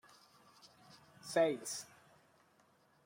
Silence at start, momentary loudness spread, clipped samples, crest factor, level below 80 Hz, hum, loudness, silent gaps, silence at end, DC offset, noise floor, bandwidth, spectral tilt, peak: 0.65 s; 27 LU; under 0.1%; 22 dB; -86 dBFS; none; -37 LUFS; none; 1.2 s; under 0.1%; -71 dBFS; 16 kHz; -3.5 dB/octave; -20 dBFS